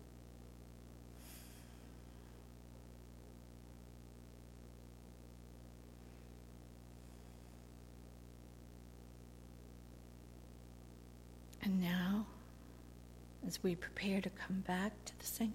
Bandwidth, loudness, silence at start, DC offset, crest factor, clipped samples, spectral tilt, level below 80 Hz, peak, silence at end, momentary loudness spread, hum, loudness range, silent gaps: 16.5 kHz; -42 LUFS; 0 s; under 0.1%; 20 dB; under 0.1%; -5 dB/octave; -60 dBFS; -26 dBFS; 0 s; 18 LU; 60 Hz at -60 dBFS; 16 LU; none